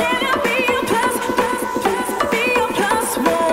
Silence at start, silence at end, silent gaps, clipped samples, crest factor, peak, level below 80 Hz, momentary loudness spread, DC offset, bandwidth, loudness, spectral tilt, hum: 0 s; 0 s; none; under 0.1%; 14 dB; -4 dBFS; -46 dBFS; 3 LU; under 0.1%; 16 kHz; -18 LUFS; -3 dB/octave; none